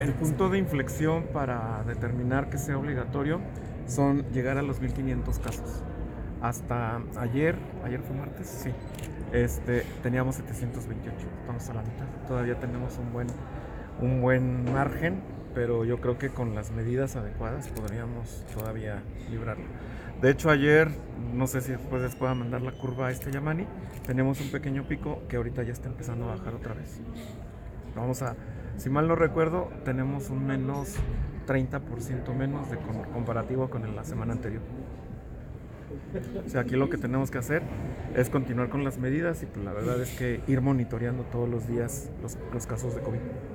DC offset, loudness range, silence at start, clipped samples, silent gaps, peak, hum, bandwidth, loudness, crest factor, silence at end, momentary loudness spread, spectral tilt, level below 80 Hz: under 0.1%; 7 LU; 0 s; under 0.1%; none; -10 dBFS; none; 17 kHz; -30 LUFS; 20 dB; 0 s; 12 LU; -7 dB/octave; -42 dBFS